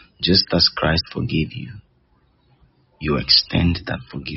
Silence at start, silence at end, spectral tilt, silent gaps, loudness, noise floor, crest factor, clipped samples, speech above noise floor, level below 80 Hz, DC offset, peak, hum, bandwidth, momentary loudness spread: 0.2 s; 0 s; -3.5 dB/octave; none; -18 LUFS; -60 dBFS; 20 dB; under 0.1%; 40 dB; -38 dBFS; under 0.1%; -2 dBFS; none; 6 kHz; 15 LU